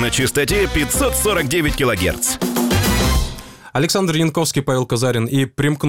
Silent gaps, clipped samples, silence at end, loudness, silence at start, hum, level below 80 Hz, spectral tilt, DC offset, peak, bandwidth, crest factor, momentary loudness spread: none; under 0.1%; 0 s; -17 LUFS; 0 s; none; -28 dBFS; -4 dB/octave; under 0.1%; -6 dBFS; 17 kHz; 12 dB; 3 LU